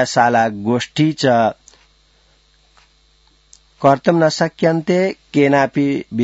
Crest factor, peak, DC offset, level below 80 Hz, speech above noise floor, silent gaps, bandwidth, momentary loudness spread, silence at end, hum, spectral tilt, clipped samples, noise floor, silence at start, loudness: 18 dB; 0 dBFS; under 0.1%; -58 dBFS; 40 dB; none; 8 kHz; 5 LU; 0 s; none; -6 dB/octave; under 0.1%; -55 dBFS; 0 s; -16 LUFS